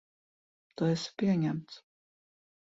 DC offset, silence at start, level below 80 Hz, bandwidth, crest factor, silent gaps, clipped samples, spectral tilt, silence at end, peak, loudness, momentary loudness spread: under 0.1%; 0.8 s; -72 dBFS; 7.8 kHz; 18 dB; none; under 0.1%; -6.5 dB/octave; 0.9 s; -18 dBFS; -32 LUFS; 22 LU